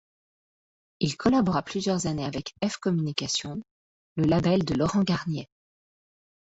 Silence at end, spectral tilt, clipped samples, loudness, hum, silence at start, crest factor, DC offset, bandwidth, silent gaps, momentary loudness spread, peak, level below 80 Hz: 1.1 s; -5.5 dB/octave; under 0.1%; -26 LUFS; none; 1 s; 20 dB; under 0.1%; 8 kHz; 3.71-4.16 s; 10 LU; -8 dBFS; -54 dBFS